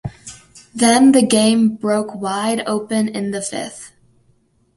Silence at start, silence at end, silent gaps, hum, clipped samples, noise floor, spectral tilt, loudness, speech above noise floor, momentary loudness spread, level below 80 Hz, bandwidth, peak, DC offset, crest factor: 0.05 s; 0.9 s; none; none; under 0.1%; -59 dBFS; -4 dB/octave; -16 LUFS; 43 dB; 21 LU; -54 dBFS; 11.5 kHz; 0 dBFS; under 0.1%; 16 dB